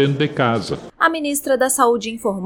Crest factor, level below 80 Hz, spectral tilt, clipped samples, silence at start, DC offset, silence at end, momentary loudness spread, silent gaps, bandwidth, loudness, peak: 16 dB; -54 dBFS; -4.5 dB/octave; under 0.1%; 0 s; under 0.1%; 0 s; 8 LU; none; over 20 kHz; -18 LUFS; -2 dBFS